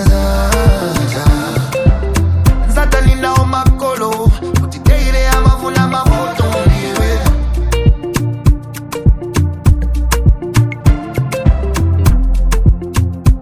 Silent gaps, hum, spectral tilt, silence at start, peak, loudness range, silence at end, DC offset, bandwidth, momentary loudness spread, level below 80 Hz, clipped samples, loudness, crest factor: none; none; -6 dB/octave; 0 s; 0 dBFS; 2 LU; 0 s; under 0.1%; 15.5 kHz; 4 LU; -14 dBFS; 0.6%; -14 LUFS; 12 dB